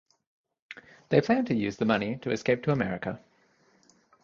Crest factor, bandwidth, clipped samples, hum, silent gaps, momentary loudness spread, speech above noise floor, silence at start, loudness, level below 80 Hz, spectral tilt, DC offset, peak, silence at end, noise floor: 22 dB; 7.4 kHz; under 0.1%; none; none; 22 LU; 38 dB; 0.7 s; -28 LUFS; -62 dBFS; -7 dB/octave; under 0.1%; -8 dBFS; 1.05 s; -65 dBFS